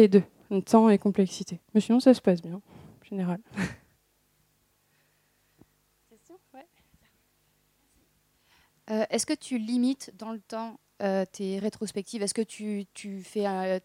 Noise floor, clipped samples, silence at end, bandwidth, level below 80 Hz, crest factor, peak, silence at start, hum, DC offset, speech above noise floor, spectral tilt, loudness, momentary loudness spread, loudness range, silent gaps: -70 dBFS; under 0.1%; 0.05 s; 14.5 kHz; -70 dBFS; 22 dB; -6 dBFS; 0 s; 50 Hz at -75 dBFS; under 0.1%; 44 dB; -6 dB/octave; -27 LUFS; 17 LU; 14 LU; none